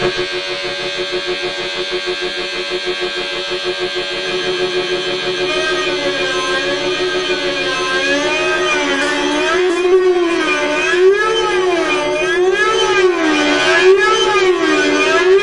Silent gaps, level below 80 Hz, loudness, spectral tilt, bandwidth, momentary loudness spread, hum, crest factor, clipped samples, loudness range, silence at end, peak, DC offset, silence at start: none; -44 dBFS; -15 LUFS; -2.5 dB/octave; 11 kHz; 7 LU; none; 14 dB; under 0.1%; 6 LU; 0 s; -2 dBFS; under 0.1%; 0 s